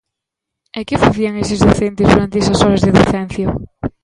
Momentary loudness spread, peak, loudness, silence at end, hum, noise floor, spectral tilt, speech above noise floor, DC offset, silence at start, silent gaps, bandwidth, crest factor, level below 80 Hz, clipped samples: 12 LU; 0 dBFS; -14 LUFS; 0.15 s; none; -80 dBFS; -6 dB/octave; 68 dB; under 0.1%; 0.75 s; none; 11.5 kHz; 14 dB; -30 dBFS; under 0.1%